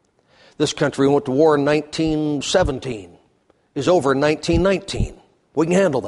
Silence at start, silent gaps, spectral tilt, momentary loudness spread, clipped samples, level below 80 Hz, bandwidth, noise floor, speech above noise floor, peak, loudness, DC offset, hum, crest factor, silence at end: 0.6 s; none; -5.5 dB/octave; 12 LU; under 0.1%; -36 dBFS; 11.5 kHz; -60 dBFS; 42 dB; -4 dBFS; -19 LUFS; under 0.1%; none; 16 dB; 0 s